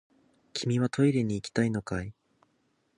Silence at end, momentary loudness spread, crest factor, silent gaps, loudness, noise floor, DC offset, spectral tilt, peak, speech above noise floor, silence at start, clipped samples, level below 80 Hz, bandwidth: 0.85 s; 11 LU; 20 dB; none; -29 LUFS; -72 dBFS; under 0.1%; -6.5 dB/octave; -12 dBFS; 45 dB; 0.55 s; under 0.1%; -56 dBFS; 11 kHz